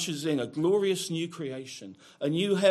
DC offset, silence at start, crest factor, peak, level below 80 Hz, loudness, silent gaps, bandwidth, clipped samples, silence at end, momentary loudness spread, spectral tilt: under 0.1%; 0 s; 20 dB; -8 dBFS; -76 dBFS; -29 LUFS; none; 14 kHz; under 0.1%; 0 s; 16 LU; -5 dB/octave